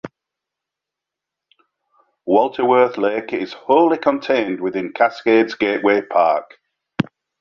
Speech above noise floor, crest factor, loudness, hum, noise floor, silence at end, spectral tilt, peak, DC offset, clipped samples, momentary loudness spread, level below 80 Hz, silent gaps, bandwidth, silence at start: 68 dB; 18 dB; -18 LUFS; none; -85 dBFS; 0.4 s; -7 dB/octave; -2 dBFS; under 0.1%; under 0.1%; 10 LU; -62 dBFS; none; 6.8 kHz; 0.05 s